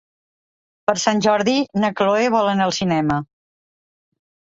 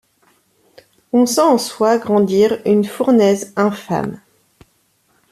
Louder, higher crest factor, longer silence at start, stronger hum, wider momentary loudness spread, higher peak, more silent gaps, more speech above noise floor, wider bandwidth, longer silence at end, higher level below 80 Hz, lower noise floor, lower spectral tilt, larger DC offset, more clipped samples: second, -19 LUFS vs -15 LUFS; about the same, 18 dB vs 14 dB; second, 0.9 s vs 1.15 s; neither; about the same, 6 LU vs 8 LU; about the same, -2 dBFS vs -2 dBFS; neither; first, over 72 dB vs 46 dB; second, 8 kHz vs 14.5 kHz; about the same, 1.25 s vs 1.15 s; about the same, -54 dBFS vs -58 dBFS; first, under -90 dBFS vs -60 dBFS; about the same, -4.5 dB/octave vs -5.5 dB/octave; neither; neither